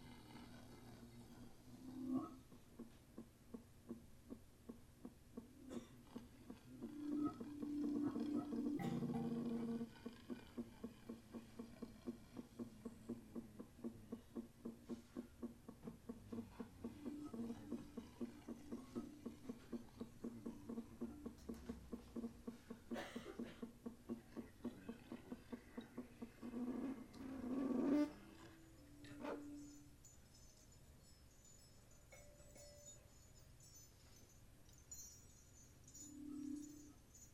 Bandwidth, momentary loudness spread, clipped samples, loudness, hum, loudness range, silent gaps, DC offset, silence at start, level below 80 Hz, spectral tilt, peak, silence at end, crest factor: 15.5 kHz; 19 LU; under 0.1%; -51 LUFS; none; 15 LU; none; under 0.1%; 0 s; -70 dBFS; -6 dB/octave; -28 dBFS; 0 s; 22 dB